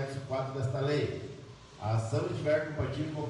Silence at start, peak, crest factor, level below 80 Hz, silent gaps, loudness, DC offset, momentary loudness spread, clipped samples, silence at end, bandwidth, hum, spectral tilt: 0 s; -16 dBFS; 16 dB; -60 dBFS; none; -33 LUFS; under 0.1%; 12 LU; under 0.1%; 0 s; 11.5 kHz; none; -7 dB/octave